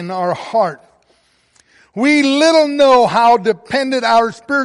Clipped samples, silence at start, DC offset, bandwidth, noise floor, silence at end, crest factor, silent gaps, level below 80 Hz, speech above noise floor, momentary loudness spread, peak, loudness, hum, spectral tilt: under 0.1%; 0 s; under 0.1%; 11.5 kHz; -57 dBFS; 0 s; 12 dB; none; -58 dBFS; 44 dB; 9 LU; -2 dBFS; -13 LUFS; none; -4 dB/octave